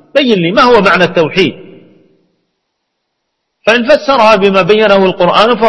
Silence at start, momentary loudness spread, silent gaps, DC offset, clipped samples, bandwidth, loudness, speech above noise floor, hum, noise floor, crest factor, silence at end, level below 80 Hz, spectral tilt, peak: 0.15 s; 5 LU; none; under 0.1%; 1%; 11 kHz; -8 LUFS; 61 dB; none; -69 dBFS; 10 dB; 0 s; -42 dBFS; -5.5 dB/octave; 0 dBFS